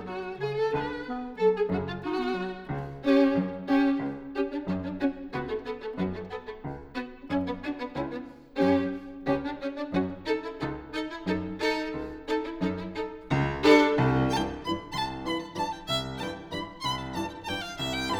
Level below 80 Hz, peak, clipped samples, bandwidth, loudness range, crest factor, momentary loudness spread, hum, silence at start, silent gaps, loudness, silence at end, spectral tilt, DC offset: -50 dBFS; -6 dBFS; under 0.1%; 14 kHz; 7 LU; 22 dB; 12 LU; none; 0 s; none; -29 LUFS; 0 s; -6 dB/octave; under 0.1%